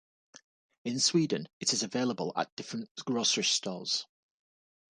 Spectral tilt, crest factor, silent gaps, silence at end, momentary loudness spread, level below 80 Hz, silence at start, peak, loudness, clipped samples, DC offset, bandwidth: -2.5 dB/octave; 20 dB; 1.53-1.60 s, 2.52-2.57 s, 2.91-2.95 s; 0.95 s; 13 LU; -80 dBFS; 0.85 s; -14 dBFS; -30 LUFS; under 0.1%; under 0.1%; 11 kHz